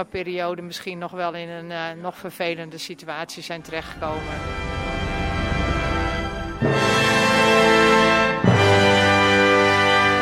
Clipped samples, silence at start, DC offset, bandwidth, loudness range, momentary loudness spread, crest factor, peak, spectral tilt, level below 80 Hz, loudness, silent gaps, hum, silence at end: under 0.1%; 0 s; under 0.1%; 16 kHz; 14 LU; 16 LU; 16 dB; -4 dBFS; -4.5 dB/octave; -36 dBFS; -19 LUFS; none; none; 0 s